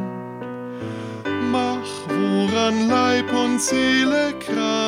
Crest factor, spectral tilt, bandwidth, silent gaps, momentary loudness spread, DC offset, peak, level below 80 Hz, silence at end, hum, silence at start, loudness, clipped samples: 14 dB; -4 dB/octave; 16 kHz; none; 13 LU; under 0.1%; -6 dBFS; -56 dBFS; 0 s; none; 0 s; -21 LUFS; under 0.1%